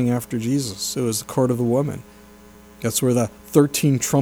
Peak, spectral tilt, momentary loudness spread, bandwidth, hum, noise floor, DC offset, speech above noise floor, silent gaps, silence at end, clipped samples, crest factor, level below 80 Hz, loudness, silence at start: -2 dBFS; -5.5 dB/octave; 6 LU; over 20 kHz; none; -46 dBFS; under 0.1%; 25 dB; none; 0 s; under 0.1%; 18 dB; -54 dBFS; -21 LUFS; 0 s